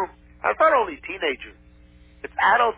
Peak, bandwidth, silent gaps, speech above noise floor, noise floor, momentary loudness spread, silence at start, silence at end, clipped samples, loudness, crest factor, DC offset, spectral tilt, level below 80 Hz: -6 dBFS; 4 kHz; none; 29 dB; -50 dBFS; 16 LU; 0 s; 0.05 s; under 0.1%; -22 LUFS; 18 dB; under 0.1%; -6.5 dB/octave; -52 dBFS